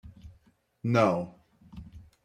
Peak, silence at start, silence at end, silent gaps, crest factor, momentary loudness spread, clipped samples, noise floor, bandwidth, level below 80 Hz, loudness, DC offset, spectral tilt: -12 dBFS; 0.05 s; 0.25 s; none; 20 dB; 26 LU; under 0.1%; -65 dBFS; 9.6 kHz; -58 dBFS; -27 LUFS; under 0.1%; -7.5 dB/octave